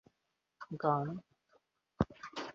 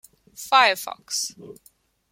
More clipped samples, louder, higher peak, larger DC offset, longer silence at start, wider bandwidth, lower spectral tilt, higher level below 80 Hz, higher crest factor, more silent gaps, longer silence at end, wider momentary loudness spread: neither; second, -37 LUFS vs -21 LUFS; second, -16 dBFS vs -2 dBFS; neither; first, 0.6 s vs 0.4 s; second, 7.4 kHz vs 16.5 kHz; first, -6 dB/octave vs 0.5 dB/octave; first, -60 dBFS vs -72 dBFS; about the same, 24 dB vs 22 dB; neither; second, 0 s vs 0.6 s; about the same, 15 LU vs 14 LU